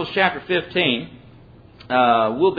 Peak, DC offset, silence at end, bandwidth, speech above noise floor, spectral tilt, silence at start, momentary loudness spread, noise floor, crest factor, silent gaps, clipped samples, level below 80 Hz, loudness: -4 dBFS; under 0.1%; 0 s; 5 kHz; 27 dB; -7.5 dB/octave; 0 s; 8 LU; -46 dBFS; 18 dB; none; under 0.1%; -54 dBFS; -19 LUFS